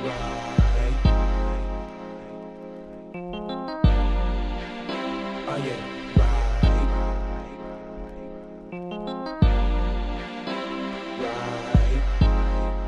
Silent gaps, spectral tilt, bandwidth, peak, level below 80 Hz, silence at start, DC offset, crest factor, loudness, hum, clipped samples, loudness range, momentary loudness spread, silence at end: none; -7.5 dB/octave; 7.2 kHz; -6 dBFS; -26 dBFS; 0 s; under 0.1%; 18 dB; -26 LUFS; none; under 0.1%; 3 LU; 16 LU; 0 s